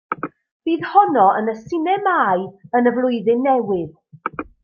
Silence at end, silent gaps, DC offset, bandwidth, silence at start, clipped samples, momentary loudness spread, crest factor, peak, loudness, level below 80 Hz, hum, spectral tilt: 0.2 s; 0.51-0.60 s; under 0.1%; 6.8 kHz; 0.1 s; under 0.1%; 14 LU; 18 dB; -2 dBFS; -18 LUFS; -60 dBFS; none; -7.5 dB/octave